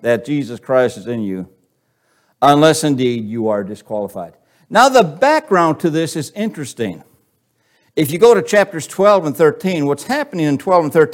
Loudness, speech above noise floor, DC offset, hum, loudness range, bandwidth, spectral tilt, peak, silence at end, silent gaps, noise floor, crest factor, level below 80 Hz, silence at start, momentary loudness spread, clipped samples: -15 LUFS; 48 dB; under 0.1%; none; 3 LU; 17 kHz; -5 dB/octave; 0 dBFS; 0 s; none; -63 dBFS; 16 dB; -60 dBFS; 0.05 s; 14 LU; under 0.1%